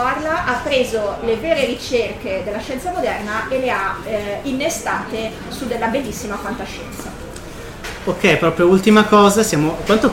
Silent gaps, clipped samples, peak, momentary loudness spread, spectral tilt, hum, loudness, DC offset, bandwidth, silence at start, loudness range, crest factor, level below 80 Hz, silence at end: none; under 0.1%; -2 dBFS; 17 LU; -4.5 dB/octave; none; -18 LUFS; under 0.1%; 17 kHz; 0 s; 8 LU; 16 dB; -40 dBFS; 0 s